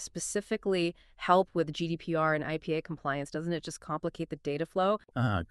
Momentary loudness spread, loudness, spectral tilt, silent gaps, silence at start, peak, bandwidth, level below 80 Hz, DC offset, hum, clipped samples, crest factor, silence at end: 9 LU; -32 LUFS; -5 dB/octave; none; 0 s; -10 dBFS; 12.5 kHz; -60 dBFS; under 0.1%; none; under 0.1%; 22 dB; 0.05 s